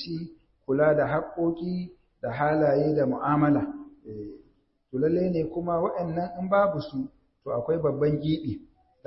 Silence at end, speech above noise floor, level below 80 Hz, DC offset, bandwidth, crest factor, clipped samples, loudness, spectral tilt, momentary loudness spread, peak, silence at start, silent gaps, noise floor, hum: 0.45 s; 39 dB; -56 dBFS; under 0.1%; 5.8 kHz; 16 dB; under 0.1%; -26 LUFS; -12 dB/octave; 17 LU; -10 dBFS; 0 s; none; -64 dBFS; none